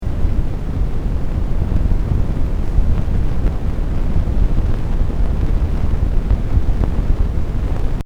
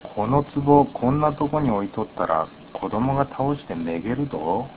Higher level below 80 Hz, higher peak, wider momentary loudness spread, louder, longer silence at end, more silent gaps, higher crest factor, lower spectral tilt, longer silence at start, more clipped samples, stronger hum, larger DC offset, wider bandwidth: first, -16 dBFS vs -46 dBFS; about the same, 0 dBFS vs -2 dBFS; second, 3 LU vs 10 LU; about the same, -21 LUFS vs -23 LUFS; about the same, 0 s vs 0 s; neither; second, 14 dB vs 20 dB; second, -8.5 dB/octave vs -12 dB/octave; about the same, 0 s vs 0 s; neither; neither; second, under 0.1% vs 0.2%; first, 5.6 kHz vs 4 kHz